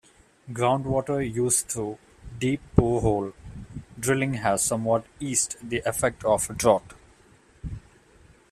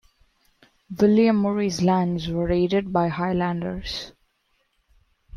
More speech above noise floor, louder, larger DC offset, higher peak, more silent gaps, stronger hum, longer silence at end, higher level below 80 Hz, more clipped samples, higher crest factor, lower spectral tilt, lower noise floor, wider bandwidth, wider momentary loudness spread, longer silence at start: second, 32 dB vs 48 dB; second, -25 LUFS vs -22 LUFS; neither; first, -4 dBFS vs -8 dBFS; neither; neither; first, 0.75 s vs 0 s; about the same, -46 dBFS vs -46 dBFS; neither; first, 24 dB vs 16 dB; second, -4.5 dB/octave vs -6.5 dB/octave; second, -57 dBFS vs -69 dBFS; first, 15.5 kHz vs 11.5 kHz; first, 18 LU vs 13 LU; second, 0.45 s vs 0.9 s